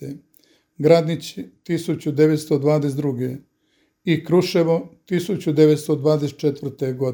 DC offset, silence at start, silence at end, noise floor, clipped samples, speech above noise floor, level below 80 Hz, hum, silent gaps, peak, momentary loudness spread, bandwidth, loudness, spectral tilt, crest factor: under 0.1%; 0 s; 0 s; -65 dBFS; under 0.1%; 46 dB; -66 dBFS; none; none; 0 dBFS; 13 LU; 19.5 kHz; -20 LUFS; -7 dB/octave; 20 dB